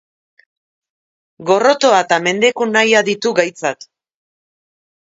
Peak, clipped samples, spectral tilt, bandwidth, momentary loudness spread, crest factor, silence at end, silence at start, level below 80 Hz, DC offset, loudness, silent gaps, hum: 0 dBFS; under 0.1%; -3 dB/octave; 8 kHz; 11 LU; 18 dB; 1.3 s; 1.4 s; -68 dBFS; under 0.1%; -14 LUFS; none; none